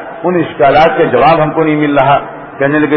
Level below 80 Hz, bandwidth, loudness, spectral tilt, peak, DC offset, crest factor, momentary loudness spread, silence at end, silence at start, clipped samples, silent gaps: -38 dBFS; 6.2 kHz; -10 LUFS; -8.5 dB/octave; 0 dBFS; under 0.1%; 10 dB; 7 LU; 0 s; 0 s; under 0.1%; none